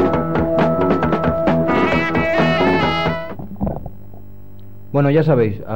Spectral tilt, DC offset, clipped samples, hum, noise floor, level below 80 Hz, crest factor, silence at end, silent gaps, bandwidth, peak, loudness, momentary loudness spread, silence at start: -8 dB/octave; 2%; under 0.1%; 50 Hz at -45 dBFS; -40 dBFS; -36 dBFS; 12 dB; 0 s; none; 16.5 kHz; -4 dBFS; -17 LUFS; 11 LU; 0 s